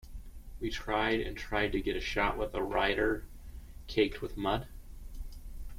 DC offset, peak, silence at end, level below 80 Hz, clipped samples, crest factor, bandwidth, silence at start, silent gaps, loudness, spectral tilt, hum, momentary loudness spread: under 0.1%; -14 dBFS; 0 s; -44 dBFS; under 0.1%; 20 dB; 16.5 kHz; 0.05 s; none; -33 LUFS; -5.5 dB/octave; none; 21 LU